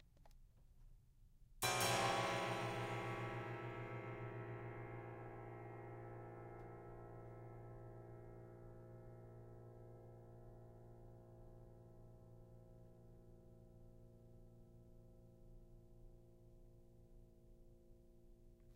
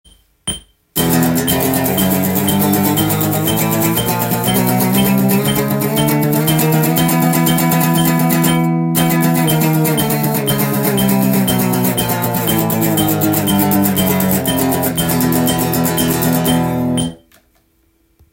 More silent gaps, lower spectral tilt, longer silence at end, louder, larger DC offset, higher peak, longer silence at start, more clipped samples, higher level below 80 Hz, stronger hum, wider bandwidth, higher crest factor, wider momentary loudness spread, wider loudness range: neither; about the same, -4 dB/octave vs -5 dB/octave; second, 0 s vs 1.15 s; second, -47 LUFS vs -14 LUFS; neither; second, -26 dBFS vs 0 dBFS; second, 0 s vs 0.45 s; neither; second, -66 dBFS vs -42 dBFS; neither; about the same, 16 kHz vs 17 kHz; first, 24 dB vs 14 dB; first, 26 LU vs 3 LU; first, 24 LU vs 2 LU